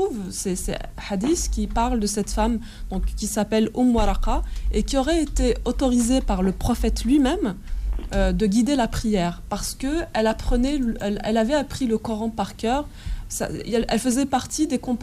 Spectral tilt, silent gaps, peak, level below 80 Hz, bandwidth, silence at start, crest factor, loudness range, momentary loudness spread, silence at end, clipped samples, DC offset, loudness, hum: -5 dB/octave; none; -10 dBFS; -30 dBFS; 15.5 kHz; 0 s; 12 dB; 3 LU; 8 LU; 0 s; under 0.1%; under 0.1%; -23 LUFS; none